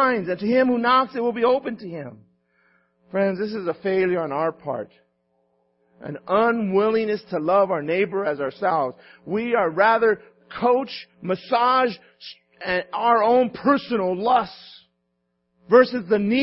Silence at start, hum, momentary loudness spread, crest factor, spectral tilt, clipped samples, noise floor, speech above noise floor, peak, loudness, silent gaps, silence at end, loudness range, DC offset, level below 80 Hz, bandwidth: 0 s; none; 16 LU; 20 dB; -10 dB/octave; under 0.1%; -74 dBFS; 52 dB; -2 dBFS; -21 LUFS; none; 0 s; 5 LU; under 0.1%; -64 dBFS; 5.8 kHz